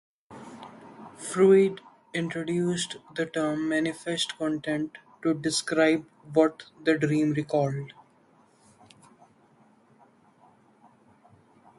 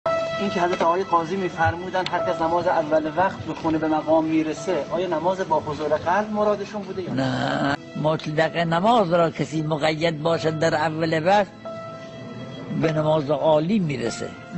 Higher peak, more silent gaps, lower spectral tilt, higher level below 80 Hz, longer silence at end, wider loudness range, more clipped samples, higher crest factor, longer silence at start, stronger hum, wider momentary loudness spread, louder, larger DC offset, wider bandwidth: about the same, -8 dBFS vs -6 dBFS; neither; about the same, -5 dB/octave vs -6 dB/octave; second, -70 dBFS vs -54 dBFS; first, 3.9 s vs 0 s; first, 5 LU vs 2 LU; neither; first, 22 dB vs 16 dB; first, 0.3 s vs 0.05 s; neither; first, 21 LU vs 9 LU; second, -27 LUFS vs -22 LUFS; neither; first, 11.5 kHz vs 8.4 kHz